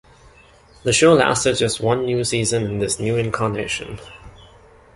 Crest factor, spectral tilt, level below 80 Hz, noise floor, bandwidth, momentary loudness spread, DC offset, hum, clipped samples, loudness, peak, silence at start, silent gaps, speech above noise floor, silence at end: 18 dB; -4 dB/octave; -46 dBFS; -49 dBFS; 11.5 kHz; 12 LU; under 0.1%; none; under 0.1%; -19 LUFS; -2 dBFS; 0.85 s; none; 30 dB; 0.65 s